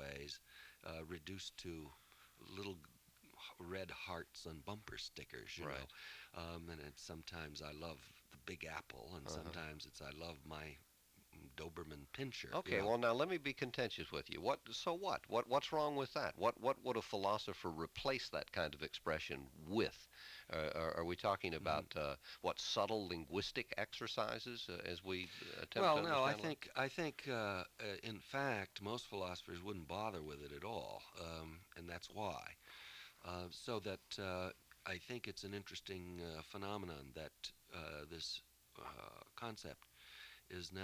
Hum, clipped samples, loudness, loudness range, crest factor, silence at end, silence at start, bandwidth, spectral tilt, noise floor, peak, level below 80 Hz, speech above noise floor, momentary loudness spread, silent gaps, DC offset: none; under 0.1%; -45 LUFS; 11 LU; 24 dB; 0 s; 0 s; 16 kHz; -4.5 dB/octave; -70 dBFS; -22 dBFS; -66 dBFS; 25 dB; 15 LU; none; under 0.1%